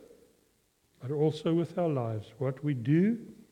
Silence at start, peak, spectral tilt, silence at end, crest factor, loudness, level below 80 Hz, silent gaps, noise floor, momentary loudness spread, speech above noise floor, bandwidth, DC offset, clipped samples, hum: 0 s; -16 dBFS; -9 dB/octave; 0.2 s; 16 dB; -30 LUFS; -72 dBFS; none; -71 dBFS; 10 LU; 41 dB; 10.5 kHz; under 0.1%; under 0.1%; none